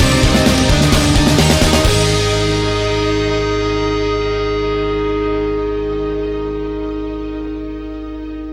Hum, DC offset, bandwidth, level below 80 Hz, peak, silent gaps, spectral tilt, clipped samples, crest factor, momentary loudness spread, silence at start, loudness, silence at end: none; under 0.1%; 16.5 kHz; -24 dBFS; 0 dBFS; none; -5 dB/octave; under 0.1%; 16 dB; 13 LU; 0 s; -15 LUFS; 0 s